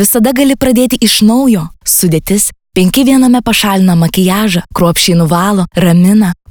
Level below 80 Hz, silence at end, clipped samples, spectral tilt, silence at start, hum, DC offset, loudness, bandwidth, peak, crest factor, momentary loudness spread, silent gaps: -34 dBFS; 0.15 s; under 0.1%; -4.5 dB/octave; 0 s; none; under 0.1%; -9 LUFS; over 20 kHz; 0 dBFS; 8 dB; 4 LU; none